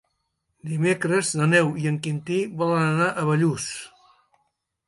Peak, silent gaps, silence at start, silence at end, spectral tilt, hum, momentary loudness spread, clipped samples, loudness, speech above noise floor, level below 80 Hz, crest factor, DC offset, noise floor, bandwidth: -6 dBFS; none; 0.65 s; 1 s; -5.5 dB/octave; none; 12 LU; under 0.1%; -23 LUFS; 53 dB; -64 dBFS; 18 dB; under 0.1%; -75 dBFS; 11.5 kHz